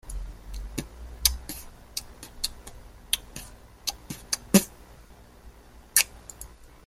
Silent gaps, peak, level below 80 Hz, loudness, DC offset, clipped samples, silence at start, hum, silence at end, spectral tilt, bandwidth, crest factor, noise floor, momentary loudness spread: none; 0 dBFS; -42 dBFS; -27 LUFS; under 0.1%; under 0.1%; 0.05 s; none; 0.1 s; -2.5 dB/octave; 16 kHz; 32 dB; -51 dBFS; 22 LU